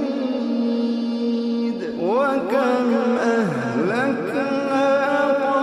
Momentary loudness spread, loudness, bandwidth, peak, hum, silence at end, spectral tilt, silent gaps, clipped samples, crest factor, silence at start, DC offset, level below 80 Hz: 4 LU; -21 LUFS; 11 kHz; -8 dBFS; none; 0 s; -6.5 dB/octave; none; under 0.1%; 12 dB; 0 s; under 0.1%; -68 dBFS